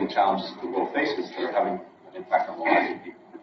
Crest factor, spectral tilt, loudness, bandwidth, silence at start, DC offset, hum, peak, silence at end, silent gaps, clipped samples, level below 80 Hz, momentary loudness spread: 20 dB; -2.5 dB/octave; -26 LUFS; 6.4 kHz; 0 s; under 0.1%; none; -8 dBFS; 0 s; none; under 0.1%; -74 dBFS; 15 LU